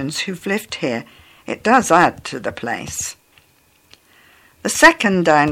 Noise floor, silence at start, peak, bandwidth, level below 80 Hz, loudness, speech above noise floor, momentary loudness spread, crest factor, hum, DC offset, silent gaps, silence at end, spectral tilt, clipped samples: -56 dBFS; 0 s; 0 dBFS; 17 kHz; -50 dBFS; -17 LUFS; 39 dB; 15 LU; 18 dB; none; under 0.1%; none; 0 s; -3.5 dB/octave; under 0.1%